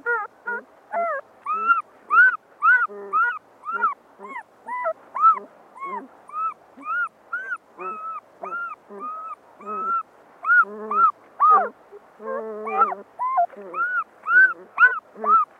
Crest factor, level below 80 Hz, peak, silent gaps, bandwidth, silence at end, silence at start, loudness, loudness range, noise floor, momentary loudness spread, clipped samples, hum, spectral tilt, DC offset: 18 dB; -84 dBFS; -4 dBFS; none; 4.9 kHz; 0.15 s; 0.05 s; -21 LUFS; 10 LU; -47 dBFS; 18 LU; under 0.1%; none; -4.5 dB/octave; under 0.1%